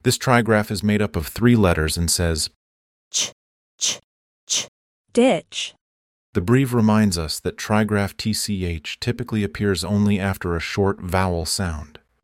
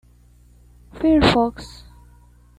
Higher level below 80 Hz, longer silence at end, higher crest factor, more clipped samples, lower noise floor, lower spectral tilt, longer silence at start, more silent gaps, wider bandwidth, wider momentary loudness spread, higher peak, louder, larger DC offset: about the same, -40 dBFS vs -38 dBFS; second, 0.4 s vs 0.9 s; about the same, 20 dB vs 22 dB; neither; first, under -90 dBFS vs -51 dBFS; second, -4.5 dB/octave vs -6 dB/octave; second, 0.05 s vs 0.95 s; first, 2.56-3.11 s, 3.32-3.78 s, 4.04-4.47 s, 4.68-5.05 s, 5.81-6.33 s vs none; first, 16.5 kHz vs 12.5 kHz; second, 9 LU vs 23 LU; about the same, -2 dBFS vs -2 dBFS; second, -21 LUFS vs -18 LUFS; neither